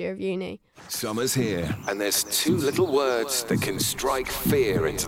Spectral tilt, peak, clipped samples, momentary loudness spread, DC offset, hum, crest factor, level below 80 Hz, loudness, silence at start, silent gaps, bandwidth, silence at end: -3.5 dB/octave; -12 dBFS; under 0.1%; 8 LU; under 0.1%; none; 14 dB; -48 dBFS; -25 LUFS; 0 s; none; 16.5 kHz; 0 s